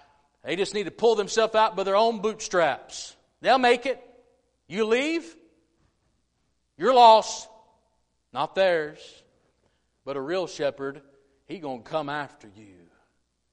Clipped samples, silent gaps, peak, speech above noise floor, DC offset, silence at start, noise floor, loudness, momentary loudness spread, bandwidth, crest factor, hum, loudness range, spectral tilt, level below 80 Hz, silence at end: under 0.1%; none; -4 dBFS; 50 dB; under 0.1%; 0.45 s; -73 dBFS; -24 LUFS; 17 LU; 10.5 kHz; 22 dB; none; 10 LU; -3.5 dB/octave; -66 dBFS; 1.25 s